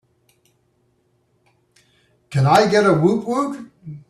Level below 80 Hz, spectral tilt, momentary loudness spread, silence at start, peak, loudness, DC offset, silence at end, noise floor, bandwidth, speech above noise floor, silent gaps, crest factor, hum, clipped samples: -58 dBFS; -6.5 dB/octave; 16 LU; 2.3 s; -2 dBFS; -17 LUFS; under 0.1%; 0.1 s; -64 dBFS; 13 kHz; 48 dB; none; 18 dB; none; under 0.1%